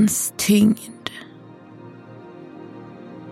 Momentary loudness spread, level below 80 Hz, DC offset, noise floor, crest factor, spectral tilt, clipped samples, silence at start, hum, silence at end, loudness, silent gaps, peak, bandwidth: 26 LU; -60 dBFS; under 0.1%; -43 dBFS; 18 dB; -4.5 dB/octave; under 0.1%; 0 s; none; 0 s; -20 LUFS; none; -4 dBFS; 16 kHz